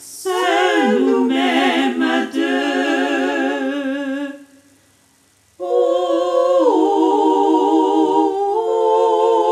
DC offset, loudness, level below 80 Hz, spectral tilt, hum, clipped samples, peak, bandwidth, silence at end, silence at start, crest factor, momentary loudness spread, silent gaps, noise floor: under 0.1%; -16 LUFS; -72 dBFS; -3.5 dB/octave; none; under 0.1%; -2 dBFS; 14.5 kHz; 0 s; 0 s; 14 dB; 7 LU; none; -56 dBFS